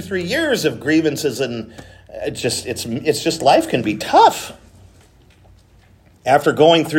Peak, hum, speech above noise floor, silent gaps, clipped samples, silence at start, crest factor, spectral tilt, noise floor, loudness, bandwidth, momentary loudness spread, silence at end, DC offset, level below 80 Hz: 0 dBFS; none; 33 dB; none; under 0.1%; 0 s; 18 dB; -4 dB/octave; -50 dBFS; -17 LUFS; 16.5 kHz; 16 LU; 0 s; under 0.1%; -52 dBFS